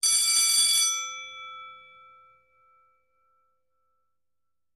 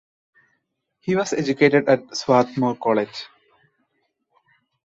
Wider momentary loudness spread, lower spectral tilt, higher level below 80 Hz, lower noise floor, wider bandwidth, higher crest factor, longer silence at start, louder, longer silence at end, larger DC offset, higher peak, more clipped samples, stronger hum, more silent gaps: first, 22 LU vs 15 LU; second, 5 dB/octave vs -5.5 dB/octave; second, -78 dBFS vs -66 dBFS; first, -89 dBFS vs -73 dBFS; first, 15.5 kHz vs 8 kHz; about the same, 18 dB vs 20 dB; second, 0.05 s vs 1.05 s; about the same, -21 LUFS vs -20 LUFS; first, 3 s vs 1.6 s; neither; second, -12 dBFS vs -2 dBFS; neither; first, 60 Hz at -85 dBFS vs none; neither